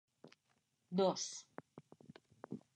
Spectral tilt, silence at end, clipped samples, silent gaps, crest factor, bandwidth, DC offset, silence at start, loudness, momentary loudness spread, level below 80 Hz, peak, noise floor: -4.5 dB/octave; 0.15 s; under 0.1%; none; 22 dB; 9.6 kHz; under 0.1%; 0.25 s; -40 LUFS; 25 LU; under -90 dBFS; -22 dBFS; -81 dBFS